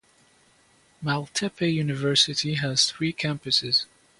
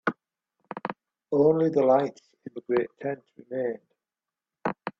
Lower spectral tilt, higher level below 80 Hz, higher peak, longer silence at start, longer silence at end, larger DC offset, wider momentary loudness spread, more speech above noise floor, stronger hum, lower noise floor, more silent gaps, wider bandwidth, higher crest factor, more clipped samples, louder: second, -3.5 dB/octave vs -8.5 dB/octave; first, -62 dBFS vs -72 dBFS; about the same, -6 dBFS vs -8 dBFS; first, 1 s vs 0.05 s; first, 0.35 s vs 0.1 s; neither; second, 8 LU vs 21 LU; second, 35 dB vs over 65 dB; neither; second, -60 dBFS vs under -90 dBFS; neither; first, 11.5 kHz vs 7.2 kHz; about the same, 20 dB vs 20 dB; neither; first, -24 LUFS vs -27 LUFS